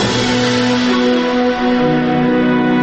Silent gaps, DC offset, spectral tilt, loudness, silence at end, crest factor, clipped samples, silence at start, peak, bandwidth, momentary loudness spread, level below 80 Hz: none; under 0.1%; -5 dB/octave; -14 LUFS; 0 s; 10 dB; under 0.1%; 0 s; -4 dBFS; 8.6 kHz; 1 LU; -42 dBFS